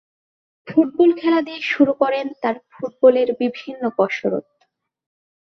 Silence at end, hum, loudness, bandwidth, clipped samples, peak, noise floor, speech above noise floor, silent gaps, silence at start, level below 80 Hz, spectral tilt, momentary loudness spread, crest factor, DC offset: 1.15 s; none; -19 LUFS; 6.4 kHz; under 0.1%; -2 dBFS; -67 dBFS; 49 dB; none; 0.65 s; -68 dBFS; -6.5 dB/octave; 10 LU; 18 dB; under 0.1%